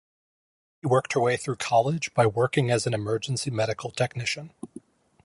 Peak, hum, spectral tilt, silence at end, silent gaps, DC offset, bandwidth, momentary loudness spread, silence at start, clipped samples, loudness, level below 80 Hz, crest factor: -8 dBFS; none; -5 dB/octave; 0.45 s; none; under 0.1%; 11.5 kHz; 10 LU; 0.85 s; under 0.1%; -26 LUFS; -62 dBFS; 18 dB